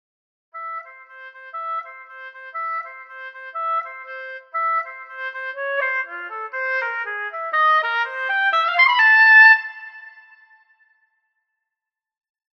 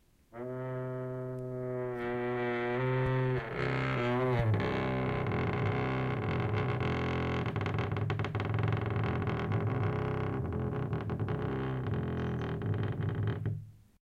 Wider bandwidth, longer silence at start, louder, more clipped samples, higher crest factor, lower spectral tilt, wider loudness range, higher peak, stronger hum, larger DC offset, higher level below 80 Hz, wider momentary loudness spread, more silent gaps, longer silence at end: about the same, 6.4 kHz vs 7 kHz; first, 0.55 s vs 0.35 s; first, -17 LUFS vs -34 LUFS; neither; first, 20 dB vs 14 dB; second, 3 dB/octave vs -8.5 dB/octave; first, 15 LU vs 3 LU; first, -2 dBFS vs -18 dBFS; neither; neither; second, under -90 dBFS vs -50 dBFS; first, 24 LU vs 7 LU; neither; first, 2.35 s vs 0.25 s